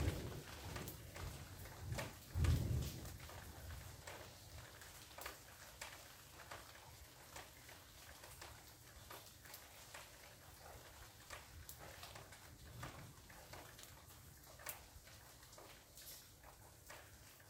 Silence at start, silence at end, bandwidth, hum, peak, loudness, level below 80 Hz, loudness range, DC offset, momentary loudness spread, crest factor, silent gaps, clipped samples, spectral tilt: 0 s; 0 s; 16 kHz; none; -26 dBFS; -52 LUFS; -58 dBFS; 11 LU; under 0.1%; 11 LU; 24 dB; none; under 0.1%; -4.5 dB/octave